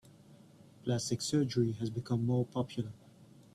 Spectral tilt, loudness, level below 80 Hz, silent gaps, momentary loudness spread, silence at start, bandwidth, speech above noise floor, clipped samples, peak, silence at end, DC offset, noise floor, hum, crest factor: -6 dB/octave; -34 LUFS; -66 dBFS; none; 9 LU; 0.3 s; 13 kHz; 25 dB; under 0.1%; -18 dBFS; 0.15 s; under 0.1%; -58 dBFS; none; 16 dB